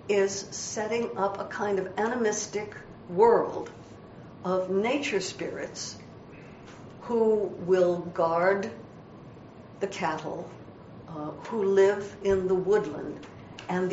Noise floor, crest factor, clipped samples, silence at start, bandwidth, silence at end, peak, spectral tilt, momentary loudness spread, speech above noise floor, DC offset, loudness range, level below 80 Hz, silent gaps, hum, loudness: -47 dBFS; 20 dB; under 0.1%; 0 s; 8 kHz; 0 s; -8 dBFS; -4.5 dB/octave; 23 LU; 20 dB; under 0.1%; 4 LU; -62 dBFS; none; none; -28 LUFS